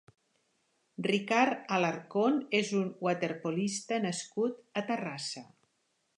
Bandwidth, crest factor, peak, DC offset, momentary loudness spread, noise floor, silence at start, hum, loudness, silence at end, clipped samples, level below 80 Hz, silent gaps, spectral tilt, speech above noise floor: 11 kHz; 22 dB; -12 dBFS; under 0.1%; 9 LU; -77 dBFS; 1 s; none; -32 LUFS; 0.75 s; under 0.1%; -82 dBFS; none; -4.5 dB/octave; 46 dB